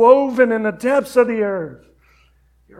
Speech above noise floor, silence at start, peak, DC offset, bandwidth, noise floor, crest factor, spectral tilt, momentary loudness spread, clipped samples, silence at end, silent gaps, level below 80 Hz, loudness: 40 dB; 0 s; 0 dBFS; under 0.1%; 14.5 kHz; -55 dBFS; 18 dB; -6 dB/octave; 11 LU; under 0.1%; 1.05 s; none; -56 dBFS; -17 LUFS